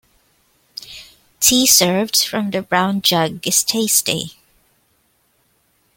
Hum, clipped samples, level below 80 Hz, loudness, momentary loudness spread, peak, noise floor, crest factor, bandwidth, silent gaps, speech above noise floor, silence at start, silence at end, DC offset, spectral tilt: none; under 0.1%; -54 dBFS; -15 LUFS; 22 LU; 0 dBFS; -62 dBFS; 20 dB; 17 kHz; none; 45 dB; 0.85 s; 1.65 s; under 0.1%; -2 dB/octave